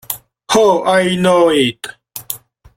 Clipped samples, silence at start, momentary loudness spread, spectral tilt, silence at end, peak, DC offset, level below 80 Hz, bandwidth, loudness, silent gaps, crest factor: under 0.1%; 0.1 s; 17 LU; -4 dB/octave; 0.4 s; 0 dBFS; under 0.1%; -50 dBFS; 16.5 kHz; -13 LUFS; none; 14 dB